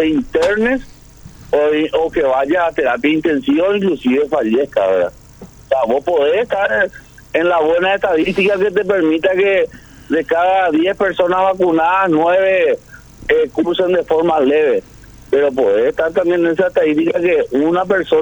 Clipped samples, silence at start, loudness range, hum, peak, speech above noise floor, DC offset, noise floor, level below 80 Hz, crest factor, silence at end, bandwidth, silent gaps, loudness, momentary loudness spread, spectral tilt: under 0.1%; 0 s; 2 LU; none; -2 dBFS; 24 dB; under 0.1%; -38 dBFS; -44 dBFS; 12 dB; 0 s; over 20 kHz; none; -15 LUFS; 4 LU; -6 dB/octave